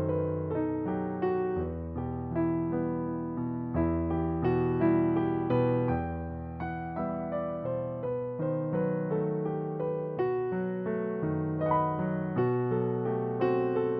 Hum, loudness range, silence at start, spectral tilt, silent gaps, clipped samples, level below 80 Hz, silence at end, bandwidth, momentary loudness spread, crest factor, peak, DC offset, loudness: none; 4 LU; 0 s; -9 dB/octave; none; under 0.1%; -50 dBFS; 0 s; 4.9 kHz; 6 LU; 16 dB; -14 dBFS; under 0.1%; -31 LUFS